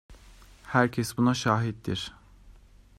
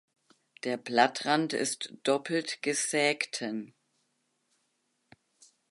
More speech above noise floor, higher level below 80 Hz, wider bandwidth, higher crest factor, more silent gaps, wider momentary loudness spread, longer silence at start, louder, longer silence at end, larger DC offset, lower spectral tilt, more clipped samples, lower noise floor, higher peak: second, 27 dB vs 47 dB; first, -54 dBFS vs -86 dBFS; first, 16 kHz vs 11.5 kHz; about the same, 22 dB vs 26 dB; neither; about the same, 9 LU vs 11 LU; second, 0.1 s vs 0.65 s; first, -27 LUFS vs -30 LUFS; second, 0.5 s vs 2.05 s; neither; first, -5.5 dB/octave vs -2.5 dB/octave; neither; second, -53 dBFS vs -77 dBFS; about the same, -8 dBFS vs -6 dBFS